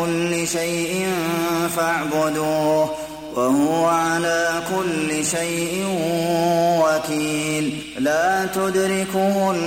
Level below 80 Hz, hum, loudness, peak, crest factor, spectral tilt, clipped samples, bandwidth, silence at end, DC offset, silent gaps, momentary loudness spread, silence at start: -54 dBFS; none; -20 LUFS; -8 dBFS; 12 dB; -4 dB/octave; under 0.1%; 16.5 kHz; 0 s; under 0.1%; none; 4 LU; 0 s